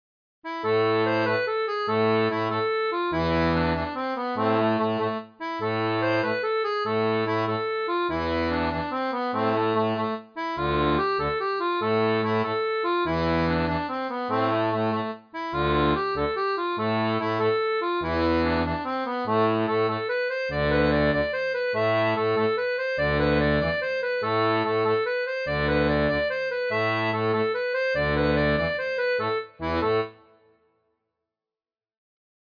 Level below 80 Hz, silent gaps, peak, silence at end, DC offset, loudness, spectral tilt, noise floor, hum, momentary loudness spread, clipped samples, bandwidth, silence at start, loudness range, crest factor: -44 dBFS; none; -12 dBFS; 2.3 s; under 0.1%; -25 LUFS; -7.5 dB/octave; under -90 dBFS; none; 5 LU; under 0.1%; 5.2 kHz; 0.45 s; 2 LU; 14 dB